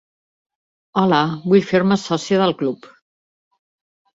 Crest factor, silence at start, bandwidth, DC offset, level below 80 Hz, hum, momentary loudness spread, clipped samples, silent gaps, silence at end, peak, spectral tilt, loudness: 18 dB; 0.95 s; 7.8 kHz; under 0.1%; -60 dBFS; none; 9 LU; under 0.1%; none; 1.3 s; -2 dBFS; -6 dB/octave; -18 LUFS